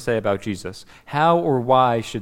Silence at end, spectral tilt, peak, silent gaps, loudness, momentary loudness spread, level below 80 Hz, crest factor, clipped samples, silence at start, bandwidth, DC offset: 0 s; -6 dB/octave; -4 dBFS; none; -20 LUFS; 13 LU; -50 dBFS; 16 dB; under 0.1%; 0 s; 16 kHz; under 0.1%